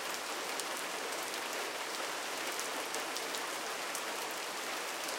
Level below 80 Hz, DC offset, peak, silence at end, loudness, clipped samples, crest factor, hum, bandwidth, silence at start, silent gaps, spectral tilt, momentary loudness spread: -84 dBFS; under 0.1%; -16 dBFS; 0 s; -37 LUFS; under 0.1%; 22 dB; none; 17 kHz; 0 s; none; 0 dB/octave; 1 LU